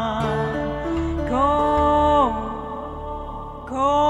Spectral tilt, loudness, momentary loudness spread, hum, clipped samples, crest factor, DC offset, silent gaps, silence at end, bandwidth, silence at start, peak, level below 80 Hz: -7 dB/octave; -22 LUFS; 14 LU; none; under 0.1%; 14 dB; under 0.1%; none; 0 s; 11 kHz; 0 s; -8 dBFS; -34 dBFS